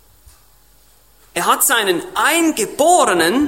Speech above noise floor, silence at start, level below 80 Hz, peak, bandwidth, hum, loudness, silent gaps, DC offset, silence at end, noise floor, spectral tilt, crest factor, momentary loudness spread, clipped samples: 37 dB; 1.35 s; -54 dBFS; -2 dBFS; 16.5 kHz; none; -14 LUFS; none; 0.1%; 0 s; -52 dBFS; -2 dB/octave; 16 dB; 6 LU; under 0.1%